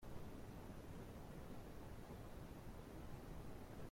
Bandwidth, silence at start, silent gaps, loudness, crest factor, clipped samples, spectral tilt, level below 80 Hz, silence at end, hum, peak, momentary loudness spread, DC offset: 16.5 kHz; 0 s; none; -56 LUFS; 16 dB; under 0.1%; -6.5 dB/octave; -60 dBFS; 0 s; none; -38 dBFS; 1 LU; under 0.1%